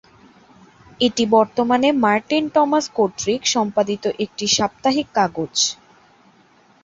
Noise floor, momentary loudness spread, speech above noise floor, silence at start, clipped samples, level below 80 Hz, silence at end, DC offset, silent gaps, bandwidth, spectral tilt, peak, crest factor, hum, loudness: -54 dBFS; 5 LU; 35 dB; 1 s; under 0.1%; -58 dBFS; 1.1 s; under 0.1%; none; 8 kHz; -3 dB/octave; -2 dBFS; 18 dB; none; -19 LUFS